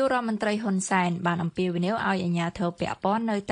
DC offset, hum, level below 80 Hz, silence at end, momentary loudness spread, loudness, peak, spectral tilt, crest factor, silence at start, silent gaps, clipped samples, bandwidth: under 0.1%; none; -58 dBFS; 0 s; 4 LU; -26 LUFS; -8 dBFS; -5.5 dB/octave; 18 dB; 0 s; none; under 0.1%; 10.5 kHz